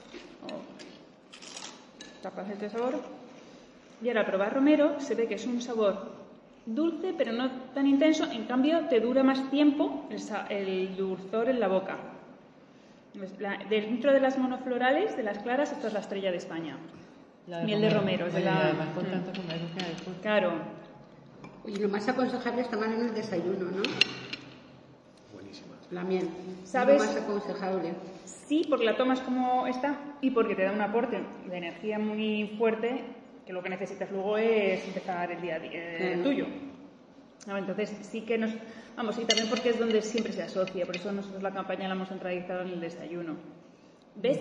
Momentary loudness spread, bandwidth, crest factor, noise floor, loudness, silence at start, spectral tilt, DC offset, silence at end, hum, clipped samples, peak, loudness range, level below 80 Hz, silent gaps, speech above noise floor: 18 LU; 10.5 kHz; 24 dB; -56 dBFS; -30 LUFS; 0 s; -5 dB/octave; under 0.1%; 0 s; none; under 0.1%; -6 dBFS; 6 LU; -74 dBFS; none; 26 dB